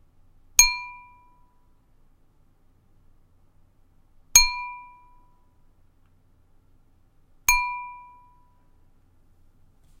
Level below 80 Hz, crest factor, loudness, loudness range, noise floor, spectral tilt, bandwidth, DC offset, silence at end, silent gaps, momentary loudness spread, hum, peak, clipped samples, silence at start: -42 dBFS; 28 dB; -20 LUFS; 5 LU; -59 dBFS; 3 dB/octave; 16 kHz; under 0.1%; 2 s; none; 25 LU; none; -2 dBFS; under 0.1%; 0.6 s